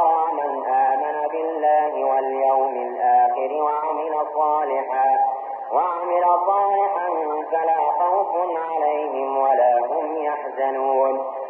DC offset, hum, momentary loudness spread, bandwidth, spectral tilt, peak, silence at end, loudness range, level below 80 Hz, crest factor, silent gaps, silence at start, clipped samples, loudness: under 0.1%; none; 6 LU; 3.5 kHz; -7 dB/octave; -8 dBFS; 0 s; 1 LU; under -90 dBFS; 12 dB; none; 0 s; under 0.1%; -21 LUFS